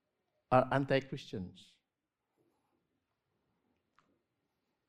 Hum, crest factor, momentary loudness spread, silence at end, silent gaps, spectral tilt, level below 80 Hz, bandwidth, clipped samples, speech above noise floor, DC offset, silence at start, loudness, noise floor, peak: none; 26 dB; 15 LU; 3.4 s; none; -7 dB/octave; -68 dBFS; 11 kHz; under 0.1%; 55 dB; under 0.1%; 0.5 s; -33 LUFS; -89 dBFS; -14 dBFS